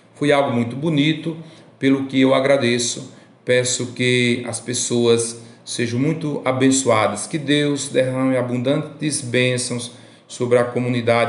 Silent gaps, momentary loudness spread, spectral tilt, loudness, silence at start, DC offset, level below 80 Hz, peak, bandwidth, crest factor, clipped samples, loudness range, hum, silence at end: none; 10 LU; -4.5 dB/octave; -19 LUFS; 0.2 s; under 0.1%; -66 dBFS; -2 dBFS; 11.5 kHz; 16 dB; under 0.1%; 2 LU; none; 0 s